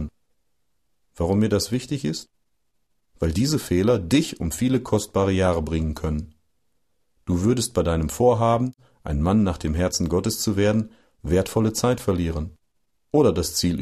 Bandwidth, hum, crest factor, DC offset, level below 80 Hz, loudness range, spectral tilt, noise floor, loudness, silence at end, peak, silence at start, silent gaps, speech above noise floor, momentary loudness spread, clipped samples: 14 kHz; none; 16 dB; under 0.1%; -38 dBFS; 3 LU; -5.5 dB/octave; -76 dBFS; -23 LUFS; 0 s; -6 dBFS; 0 s; none; 54 dB; 10 LU; under 0.1%